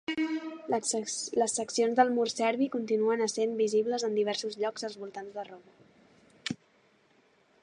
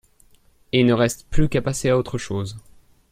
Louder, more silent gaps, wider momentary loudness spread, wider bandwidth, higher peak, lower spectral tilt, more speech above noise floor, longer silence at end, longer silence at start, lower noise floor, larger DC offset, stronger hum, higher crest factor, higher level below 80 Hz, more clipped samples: second, -30 LUFS vs -21 LUFS; neither; first, 14 LU vs 11 LU; second, 11.5 kHz vs 15.5 kHz; second, -10 dBFS vs -2 dBFS; second, -3 dB/octave vs -5.5 dB/octave; about the same, 36 dB vs 35 dB; first, 1.1 s vs 0.55 s; second, 0.1 s vs 0.75 s; first, -66 dBFS vs -55 dBFS; neither; neither; about the same, 22 dB vs 18 dB; second, -78 dBFS vs -34 dBFS; neither